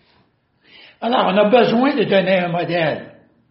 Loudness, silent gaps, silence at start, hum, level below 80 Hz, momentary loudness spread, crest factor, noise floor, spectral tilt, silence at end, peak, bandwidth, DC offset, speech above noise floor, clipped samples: -16 LUFS; none; 1 s; none; -64 dBFS; 8 LU; 18 dB; -60 dBFS; -4 dB/octave; 0.4 s; 0 dBFS; 5.8 kHz; under 0.1%; 44 dB; under 0.1%